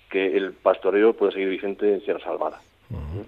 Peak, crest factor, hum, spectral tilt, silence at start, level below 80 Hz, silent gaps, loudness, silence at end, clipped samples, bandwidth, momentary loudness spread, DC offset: -4 dBFS; 18 dB; none; -8 dB/octave; 0.1 s; -48 dBFS; none; -23 LUFS; 0 s; under 0.1%; 4.3 kHz; 13 LU; under 0.1%